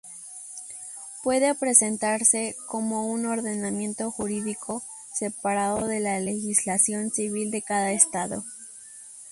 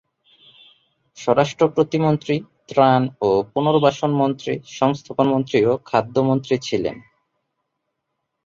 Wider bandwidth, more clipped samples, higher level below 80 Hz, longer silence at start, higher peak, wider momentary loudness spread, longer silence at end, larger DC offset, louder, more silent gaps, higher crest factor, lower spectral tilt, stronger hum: first, 11.5 kHz vs 7.6 kHz; neither; second, -64 dBFS vs -58 dBFS; second, 0.05 s vs 1.15 s; about the same, -2 dBFS vs -2 dBFS; first, 17 LU vs 8 LU; second, 0 s vs 1.45 s; neither; second, -24 LUFS vs -20 LUFS; neither; first, 24 dB vs 18 dB; second, -3.5 dB/octave vs -6.5 dB/octave; neither